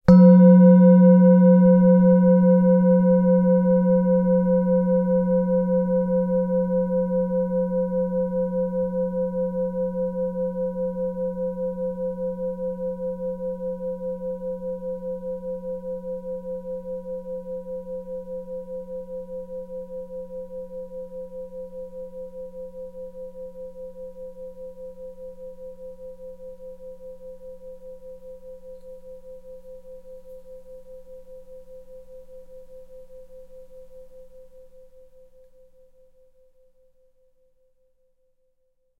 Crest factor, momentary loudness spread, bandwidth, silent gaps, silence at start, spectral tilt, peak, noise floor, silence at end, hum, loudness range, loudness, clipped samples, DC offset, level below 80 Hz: 20 dB; 26 LU; 2.2 kHz; none; 0.05 s; -12 dB/octave; -2 dBFS; -67 dBFS; 4.4 s; none; 26 LU; -20 LUFS; under 0.1%; under 0.1%; -52 dBFS